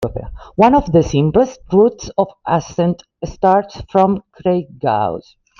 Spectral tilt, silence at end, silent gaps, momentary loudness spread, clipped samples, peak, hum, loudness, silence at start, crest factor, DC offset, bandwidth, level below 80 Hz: -7.5 dB/octave; 0.4 s; none; 12 LU; under 0.1%; -2 dBFS; none; -16 LUFS; 0 s; 14 dB; under 0.1%; 7.2 kHz; -38 dBFS